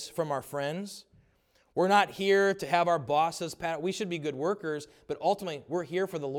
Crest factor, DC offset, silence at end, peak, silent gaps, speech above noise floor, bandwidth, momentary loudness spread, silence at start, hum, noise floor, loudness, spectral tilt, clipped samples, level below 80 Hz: 20 dB; under 0.1%; 0 s; -10 dBFS; none; 39 dB; 17.5 kHz; 12 LU; 0 s; none; -68 dBFS; -29 LUFS; -4.5 dB/octave; under 0.1%; -70 dBFS